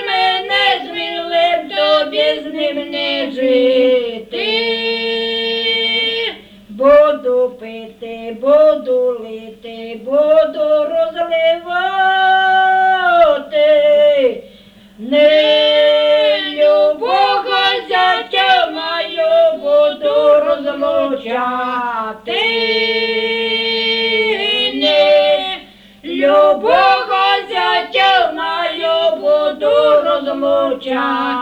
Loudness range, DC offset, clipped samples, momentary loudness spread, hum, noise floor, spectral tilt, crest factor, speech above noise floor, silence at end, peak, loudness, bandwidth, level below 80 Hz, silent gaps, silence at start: 3 LU; under 0.1%; under 0.1%; 9 LU; none; -42 dBFS; -3.5 dB/octave; 14 dB; 25 dB; 0 s; 0 dBFS; -13 LUFS; 8.4 kHz; -54 dBFS; none; 0 s